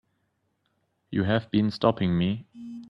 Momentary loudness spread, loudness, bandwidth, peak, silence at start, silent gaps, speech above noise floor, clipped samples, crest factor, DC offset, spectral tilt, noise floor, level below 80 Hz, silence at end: 10 LU; -26 LUFS; 6 kHz; -8 dBFS; 1.1 s; none; 50 dB; under 0.1%; 20 dB; under 0.1%; -8.5 dB/octave; -74 dBFS; -58 dBFS; 0 s